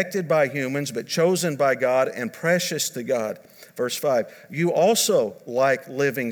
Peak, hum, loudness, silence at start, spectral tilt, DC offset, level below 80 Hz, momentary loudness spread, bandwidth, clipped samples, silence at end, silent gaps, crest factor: -6 dBFS; none; -23 LUFS; 0 s; -4 dB/octave; under 0.1%; -78 dBFS; 8 LU; 20 kHz; under 0.1%; 0 s; none; 16 dB